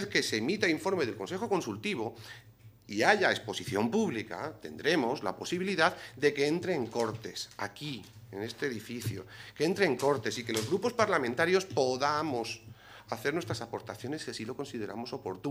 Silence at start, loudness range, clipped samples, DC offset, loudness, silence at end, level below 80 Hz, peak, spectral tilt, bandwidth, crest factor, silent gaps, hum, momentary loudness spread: 0 s; 5 LU; under 0.1%; under 0.1%; -32 LUFS; 0 s; -70 dBFS; -8 dBFS; -4.5 dB/octave; 16 kHz; 24 dB; none; none; 12 LU